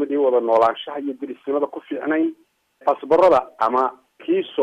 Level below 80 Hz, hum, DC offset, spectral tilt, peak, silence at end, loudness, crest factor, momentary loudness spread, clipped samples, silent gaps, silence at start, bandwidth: -62 dBFS; none; under 0.1%; -6 dB/octave; -4 dBFS; 0 s; -20 LUFS; 16 dB; 12 LU; under 0.1%; none; 0 s; 8.4 kHz